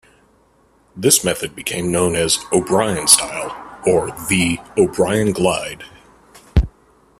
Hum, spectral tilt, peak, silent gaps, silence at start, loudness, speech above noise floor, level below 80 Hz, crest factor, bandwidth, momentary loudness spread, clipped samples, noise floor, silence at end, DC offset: none; -3.5 dB/octave; 0 dBFS; none; 0.95 s; -17 LUFS; 38 dB; -32 dBFS; 18 dB; 16 kHz; 12 LU; under 0.1%; -55 dBFS; 0.5 s; under 0.1%